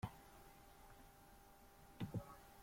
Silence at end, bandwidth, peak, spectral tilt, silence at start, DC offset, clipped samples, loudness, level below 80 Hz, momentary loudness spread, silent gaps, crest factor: 0 s; 16.5 kHz; -32 dBFS; -6.5 dB/octave; 0 s; under 0.1%; under 0.1%; -56 LUFS; -68 dBFS; 16 LU; none; 22 dB